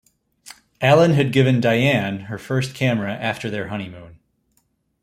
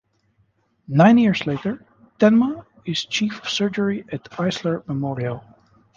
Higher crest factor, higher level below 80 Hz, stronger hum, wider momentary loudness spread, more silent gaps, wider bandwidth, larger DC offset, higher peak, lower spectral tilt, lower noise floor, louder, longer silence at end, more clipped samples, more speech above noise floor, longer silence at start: about the same, 18 dB vs 18 dB; about the same, -56 dBFS vs -58 dBFS; neither; about the same, 14 LU vs 14 LU; neither; first, 15 kHz vs 7.4 kHz; neither; about the same, -2 dBFS vs -2 dBFS; about the same, -6.5 dB/octave vs -6 dB/octave; about the same, -67 dBFS vs -64 dBFS; about the same, -19 LUFS vs -20 LUFS; first, 0.9 s vs 0.55 s; neither; about the same, 48 dB vs 45 dB; second, 0.45 s vs 0.9 s